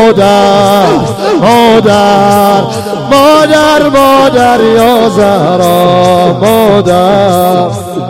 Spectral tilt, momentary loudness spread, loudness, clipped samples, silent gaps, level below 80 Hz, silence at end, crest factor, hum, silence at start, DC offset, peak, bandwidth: -5.5 dB/octave; 4 LU; -6 LUFS; 1%; none; -36 dBFS; 0 s; 6 dB; none; 0 s; under 0.1%; 0 dBFS; 17 kHz